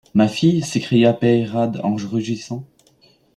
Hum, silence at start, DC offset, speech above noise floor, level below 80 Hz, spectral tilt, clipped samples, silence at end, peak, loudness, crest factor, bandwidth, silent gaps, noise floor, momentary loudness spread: none; 0.15 s; under 0.1%; 38 dB; -58 dBFS; -6.5 dB/octave; under 0.1%; 0.7 s; -2 dBFS; -18 LUFS; 16 dB; 11.5 kHz; none; -55 dBFS; 11 LU